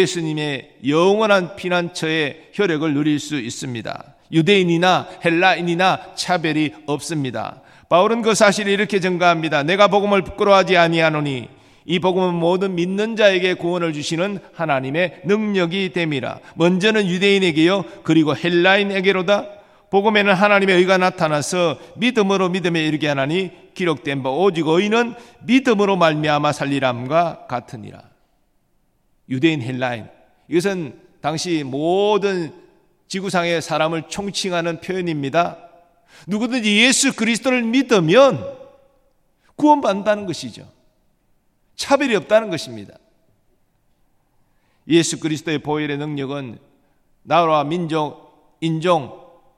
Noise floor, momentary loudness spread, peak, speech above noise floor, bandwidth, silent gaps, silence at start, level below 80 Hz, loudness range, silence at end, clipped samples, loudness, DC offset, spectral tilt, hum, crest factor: -62 dBFS; 12 LU; 0 dBFS; 45 dB; 14 kHz; none; 0 s; -60 dBFS; 7 LU; 0.4 s; under 0.1%; -18 LUFS; under 0.1%; -4.5 dB/octave; none; 18 dB